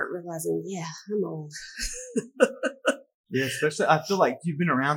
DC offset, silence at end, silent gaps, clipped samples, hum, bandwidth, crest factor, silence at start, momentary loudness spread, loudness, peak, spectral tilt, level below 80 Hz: under 0.1%; 0 s; 3.14-3.24 s; under 0.1%; none; 18 kHz; 22 dB; 0 s; 11 LU; -27 LUFS; -6 dBFS; -4.5 dB/octave; -52 dBFS